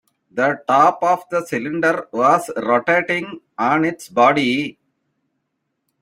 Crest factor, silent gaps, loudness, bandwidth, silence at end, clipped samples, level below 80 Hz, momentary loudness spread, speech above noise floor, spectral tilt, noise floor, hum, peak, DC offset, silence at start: 18 dB; none; -18 LUFS; 16 kHz; 1.3 s; under 0.1%; -64 dBFS; 9 LU; 56 dB; -5 dB/octave; -74 dBFS; none; -2 dBFS; under 0.1%; 0.35 s